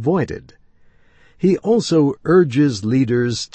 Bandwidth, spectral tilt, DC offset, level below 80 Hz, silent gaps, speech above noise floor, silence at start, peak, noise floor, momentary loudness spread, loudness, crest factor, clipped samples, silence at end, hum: 8.8 kHz; -6.5 dB/octave; under 0.1%; -52 dBFS; none; 34 dB; 0 s; -2 dBFS; -50 dBFS; 6 LU; -17 LUFS; 14 dB; under 0.1%; 0.1 s; none